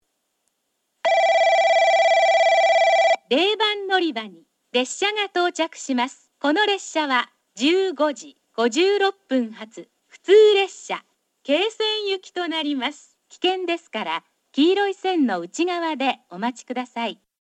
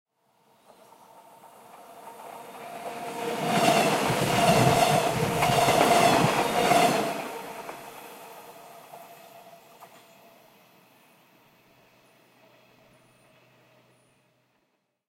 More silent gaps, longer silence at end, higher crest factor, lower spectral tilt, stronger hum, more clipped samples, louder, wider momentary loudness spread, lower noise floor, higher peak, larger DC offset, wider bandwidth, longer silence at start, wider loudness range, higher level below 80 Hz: neither; second, 0.25 s vs 5.25 s; second, 16 dB vs 24 dB; second, -2 dB/octave vs -4 dB/octave; neither; neither; about the same, -21 LUFS vs -23 LUFS; second, 14 LU vs 26 LU; about the same, -74 dBFS vs -75 dBFS; about the same, -4 dBFS vs -4 dBFS; neither; second, 10 kHz vs 16 kHz; second, 1.05 s vs 1.75 s; second, 6 LU vs 21 LU; second, -82 dBFS vs -56 dBFS